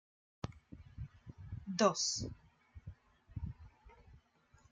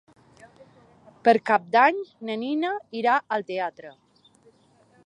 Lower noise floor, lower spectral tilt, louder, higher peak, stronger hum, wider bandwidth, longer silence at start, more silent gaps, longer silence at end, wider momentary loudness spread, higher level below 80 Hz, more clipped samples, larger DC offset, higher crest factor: first, -69 dBFS vs -60 dBFS; second, -3.5 dB/octave vs -5.5 dB/octave; second, -38 LUFS vs -24 LUFS; second, -16 dBFS vs -4 dBFS; neither; about the same, 10.5 kHz vs 9.6 kHz; second, 0.45 s vs 1.25 s; neither; second, 0.55 s vs 1.15 s; first, 25 LU vs 12 LU; first, -60 dBFS vs -78 dBFS; neither; neither; about the same, 26 dB vs 22 dB